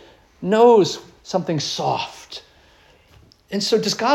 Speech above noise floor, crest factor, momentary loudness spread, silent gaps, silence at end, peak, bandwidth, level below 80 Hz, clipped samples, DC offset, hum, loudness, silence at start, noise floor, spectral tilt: 34 dB; 18 dB; 20 LU; none; 0 s; -4 dBFS; 13 kHz; -60 dBFS; under 0.1%; under 0.1%; none; -19 LUFS; 0.4 s; -53 dBFS; -4.5 dB/octave